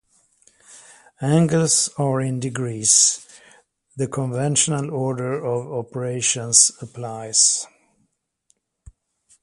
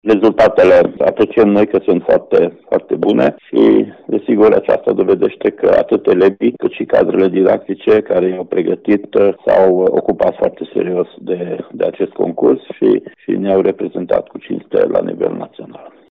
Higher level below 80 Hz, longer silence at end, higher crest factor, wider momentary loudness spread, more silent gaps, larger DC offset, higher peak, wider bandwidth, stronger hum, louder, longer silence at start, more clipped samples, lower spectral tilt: second, -60 dBFS vs -50 dBFS; first, 1.75 s vs 0.25 s; first, 22 dB vs 10 dB; first, 15 LU vs 9 LU; neither; neither; about the same, 0 dBFS vs -2 dBFS; first, 11.5 kHz vs 6.4 kHz; neither; second, -19 LUFS vs -14 LUFS; first, 0.7 s vs 0.05 s; neither; second, -3 dB/octave vs -8.5 dB/octave